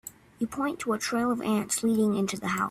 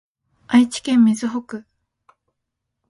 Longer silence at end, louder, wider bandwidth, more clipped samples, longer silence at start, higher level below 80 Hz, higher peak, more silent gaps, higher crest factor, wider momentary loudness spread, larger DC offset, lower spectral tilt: second, 0 s vs 1.3 s; second, -28 LUFS vs -18 LUFS; first, 15.5 kHz vs 11.5 kHz; neither; second, 0.05 s vs 0.5 s; about the same, -62 dBFS vs -64 dBFS; second, -14 dBFS vs -2 dBFS; neither; about the same, 14 dB vs 18 dB; second, 8 LU vs 17 LU; neither; about the same, -4.5 dB/octave vs -4.5 dB/octave